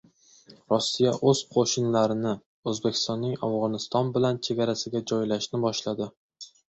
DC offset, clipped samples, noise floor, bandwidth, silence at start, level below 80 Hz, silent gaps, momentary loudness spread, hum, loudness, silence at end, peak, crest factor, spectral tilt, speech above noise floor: under 0.1%; under 0.1%; -55 dBFS; 8.2 kHz; 0.5 s; -64 dBFS; 2.46-2.63 s, 6.17-6.29 s; 9 LU; none; -26 LUFS; 0.2 s; -8 dBFS; 18 dB; -5 dB/octave; 29 dB